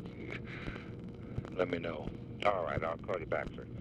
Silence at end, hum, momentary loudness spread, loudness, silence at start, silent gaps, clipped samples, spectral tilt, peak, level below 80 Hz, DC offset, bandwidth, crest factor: 0 s; none; 11 LU; -38 LUFS; 0 s; none; under 0.1%; -7.5 dB/octave; -16 dBFS; -54 dBFS; under 0.1%; 10 kHz; 22 dB